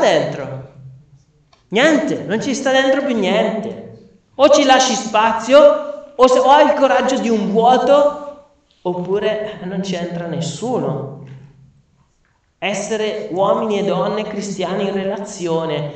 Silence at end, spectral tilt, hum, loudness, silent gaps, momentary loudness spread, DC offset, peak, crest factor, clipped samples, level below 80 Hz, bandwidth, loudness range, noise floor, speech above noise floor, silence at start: 0 s; -4.5 dB/octave; none; -16 LUFS; none; 14 LU; under 0.1%; 0 dBFS; 16 dB; under 0.1%; -56 dBFS; 8.8 kHz; 11 LU; -60 dBFS; 45 dB; 0 s